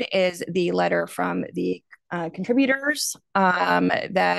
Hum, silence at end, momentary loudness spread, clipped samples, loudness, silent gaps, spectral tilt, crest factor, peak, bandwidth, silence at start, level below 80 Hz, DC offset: none; 0 s; 9 LU; under 0.1%; -23 LUFS; none; -4.5 dB/octave; 18 dB; -4 dBFS; 12.5 kHz; 0 s; -68 dBFS; under 0.1%